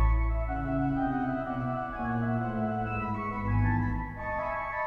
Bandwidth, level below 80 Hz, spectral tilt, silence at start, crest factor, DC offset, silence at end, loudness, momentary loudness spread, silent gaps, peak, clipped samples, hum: 4.2 kHz; -34 dBFS; -10 dB/octave; 0 s; 14 dB; under 0.1%; 0 s; -31 LUFS; 5 LU; none; -16 dBFS; under 0.1%; none